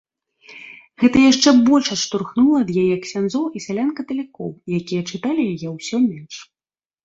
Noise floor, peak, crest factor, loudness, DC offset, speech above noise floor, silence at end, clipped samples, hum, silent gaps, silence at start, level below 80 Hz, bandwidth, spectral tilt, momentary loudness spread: under -90 dBFS; -2 dBFS; 18 dB; -18 LUFS; under 0.1%; over 72 dB; 0.6 s; under 0.1%; none; none; 0.5 s; -56 dBFS; 7.8 kHz; -4.5 dB/octave; 21 LU